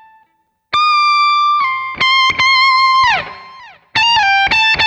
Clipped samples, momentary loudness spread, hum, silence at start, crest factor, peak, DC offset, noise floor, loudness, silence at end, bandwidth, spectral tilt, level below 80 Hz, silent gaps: under 0.1%; 8 LU; none; 0.7 s; 10 dB; -4 dBFS; under 0.1%; -60 dBFS; -11 LUFS; 0 s; 9.4 kHz; -0.5 dB/octave; -46 dBFS; none